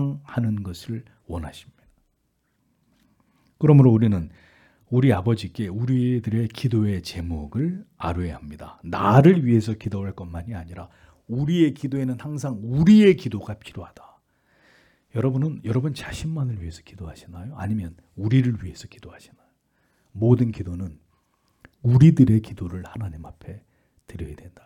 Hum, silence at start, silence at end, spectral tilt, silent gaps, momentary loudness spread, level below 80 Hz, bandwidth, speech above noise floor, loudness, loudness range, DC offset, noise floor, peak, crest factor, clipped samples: none; 0 s; 0.2 s; -8.5 dB/octave; none; 24 LU; -50 dBFS; 11.5 kHz; 49 dB; -21 LUFS; 8 LU; under 0.1%; -71 dBFS; -2 dBFS; 20 dB; under 0.1%